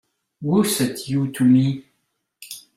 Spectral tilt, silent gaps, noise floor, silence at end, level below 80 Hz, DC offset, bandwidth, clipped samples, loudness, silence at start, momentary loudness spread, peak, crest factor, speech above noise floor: -5.5 dB/octave; none; -73 dBFS; 0.2 s; -60 dBFS; under 0.1%; 16 kHz; under 0.1%; -20 LUFS; 0.4 s; 17 LU; -6 dBFS; 16 dB; 54 dB